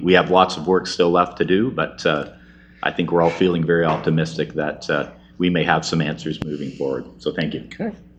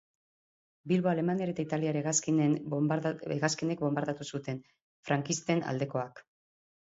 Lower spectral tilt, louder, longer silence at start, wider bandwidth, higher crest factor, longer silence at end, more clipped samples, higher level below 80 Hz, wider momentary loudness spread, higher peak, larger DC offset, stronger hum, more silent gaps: about the same, -6 dB/octave vs -5 dB/octave; first, -20 LUFS vs -31 LUFS; second, 0 s vs 0.85 s; first, 9.2 kHz vs 8 kHz; about the same, 20 dB vs 20 dB; second, 0.15 s vs 0.7 s; neither; first, -50 dBFS vs -72 dBFS; about the same, 10 LU vs 10 LU; first, 0 dBFS vs -12 dBFS; neither; neither; second, none vs 4.82-5.03 s